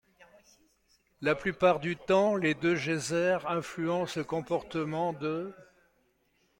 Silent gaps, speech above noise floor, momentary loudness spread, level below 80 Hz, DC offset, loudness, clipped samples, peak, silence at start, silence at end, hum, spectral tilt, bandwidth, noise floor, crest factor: none; 42 dB; 8 LU; -64 dBFS; under 0.1%; -30 LUFS; under 0.1%; -12 dBFS; 1.2 s; 0.95 s; none; -5.5 dB/octave; 16.5 kHz; -72 dBFS; 20 dB